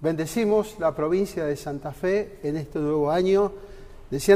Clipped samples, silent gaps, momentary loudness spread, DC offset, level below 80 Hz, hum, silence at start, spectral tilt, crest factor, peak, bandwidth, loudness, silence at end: under 0.1%; none; 9 LU; under 0.1%; -48 dBFS; none; 0 s; -6 dB/octave; 18 dB; -6 dBFS; 15.5 kHz; -25 LUFS; 0 s